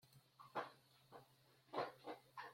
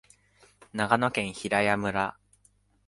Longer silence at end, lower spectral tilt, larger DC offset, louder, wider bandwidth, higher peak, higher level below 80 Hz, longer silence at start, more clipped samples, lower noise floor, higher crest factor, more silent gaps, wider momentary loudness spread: second, 0 s vs 0.75 s; about the same, -5 dB/octave vs -5 dB/octave; neither; second, -52 LUFS vs -27 LUFS; first, 16.5 kHz vs 11.5 kHz; second, -32 dBFS vs -4 dBFS; second, under -90 dBFS vs -60 dBFS; second, 0.05 s vs 0.75 s; neither; first, -73 dBFS vs -65 dBFS; about the same, 22 dB vs 26 dB; neither; first, 17 LU vs 8 LU